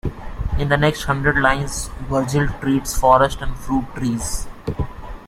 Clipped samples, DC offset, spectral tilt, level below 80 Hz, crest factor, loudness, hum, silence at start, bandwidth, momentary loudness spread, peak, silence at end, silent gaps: under 0.1%; under 0.1%; -5 dB/octave; -30 dBFS; 18 dB; -20 LUFS; none; 0.05 s; 16 kHz; 13 LU; -2 dBFS; 0 s; none